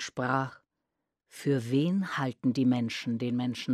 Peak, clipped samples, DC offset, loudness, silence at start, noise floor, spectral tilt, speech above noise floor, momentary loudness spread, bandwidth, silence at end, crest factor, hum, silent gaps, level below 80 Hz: -12 dBFS; under 0.1%; under 0.1%; -30 LUFS; 0 s; -85 dBFS; -6.5 dB/octave; 56 dB; 5 LU; 13 kHz; 0 s; 18 dB; none; none; -74 dBFS